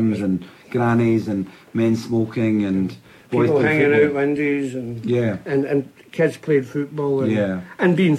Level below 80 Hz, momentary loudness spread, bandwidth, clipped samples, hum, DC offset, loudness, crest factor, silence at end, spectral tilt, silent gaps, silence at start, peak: -58 dBFS; 10 LU; 13.5 kHz; under 0.1%; none; under 0.1%; -20 LUFS; 14 dB; 0 s; -8 dB/octave; none; 0 s; -4 dBFS